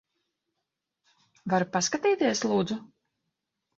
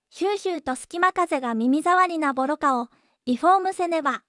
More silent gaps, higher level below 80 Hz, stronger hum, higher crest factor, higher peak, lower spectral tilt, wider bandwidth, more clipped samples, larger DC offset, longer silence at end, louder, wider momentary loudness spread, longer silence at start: neither; about the same, -70 dBFS vs -66 dBFS; neither; about the same, 20 dB vs 16 dB; about the same, -10 dBFS vs -8 dBFS; about the same, -4 dB/octave vs -3.5 dB/octave; second, 8 kHz vs 12 kHz; neither; neither; first, 0.9 s vs 0.1 s; second, -27 LUFS vs -23 LUFS; about the same, 10 LU vs 9 LU; first, 1.45 s vs 0.15 s